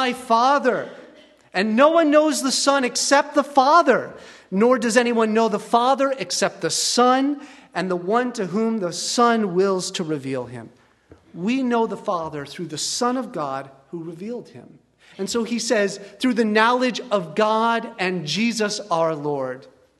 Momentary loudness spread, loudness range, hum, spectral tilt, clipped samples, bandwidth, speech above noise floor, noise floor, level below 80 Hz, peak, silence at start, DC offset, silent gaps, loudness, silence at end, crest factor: 14 LU; 8 LU; none; -3.5 dB/octave; under 0.1%; 12.5 kHz; 32 dB; -52 dBFS; -68 dBFS; -2 dBFS; 0 s; under 0.1%; none; -20 LUFS; 0.35 s; 20 dB